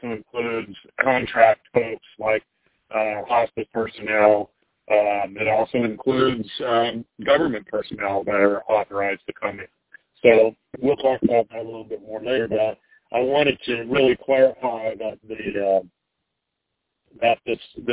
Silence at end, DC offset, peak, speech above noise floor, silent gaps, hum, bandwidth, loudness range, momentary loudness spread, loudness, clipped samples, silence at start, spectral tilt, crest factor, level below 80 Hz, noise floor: 0 s; under 0.1%; -2 dBFS; 58 dB; none; none; 4 kHz; 2 LU; 13 LU; -22 LUFS; under 0.1%; 0.05 s; -9 dB/octave; 20 dB; -56 dBFS; -79 dBFS